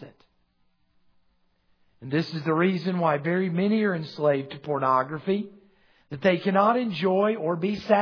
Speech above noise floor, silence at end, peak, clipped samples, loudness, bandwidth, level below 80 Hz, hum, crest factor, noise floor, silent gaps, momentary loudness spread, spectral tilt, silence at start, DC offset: 43 dB; 0 s; -6 dBFS; under 0.1%; -25 LUFS; 5.4 kHz; -68 dBFS; none; 20 dB; -68 dBFS; none; 7 LU; -8 dB/octave; 0 s; under 0.1%